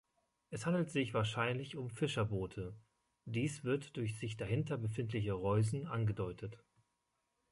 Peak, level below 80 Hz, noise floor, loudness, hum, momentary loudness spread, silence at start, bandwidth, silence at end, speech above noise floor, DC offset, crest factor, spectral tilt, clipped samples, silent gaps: -22 dBFS; -62 dBFS; -84 dBFS; -38 LUFS; none; 10 LU; 0.5 s; 11.5 kHz; 0.95 s; 47 dB; under 0.1%; 18 dB; -6.5 dB/octave; under 0.1%; none